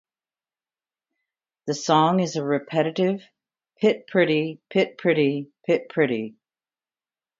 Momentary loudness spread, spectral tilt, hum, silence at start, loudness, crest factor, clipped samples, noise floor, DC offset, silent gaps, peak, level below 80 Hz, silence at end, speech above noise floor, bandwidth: 10 LU; -5.5 dB/octave; none; 1.65 s; -23 LUFS; 20 dB; under 0.1%; under -90 dBFS; under 0.1%; none; -6 dBFS; -74 dBFS; 1.1 s; over 68 dB; 7.8 kHz